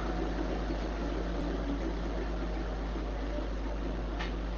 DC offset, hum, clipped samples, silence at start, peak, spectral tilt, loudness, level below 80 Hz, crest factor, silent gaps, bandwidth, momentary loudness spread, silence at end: under 0.1%; none; under 0.1%; 0 s; -20 dBFS; -7 dB/octave; -36 LUFS; -36 dBFS; 12 dB; none; 7 kHz; 2 LU; 0 s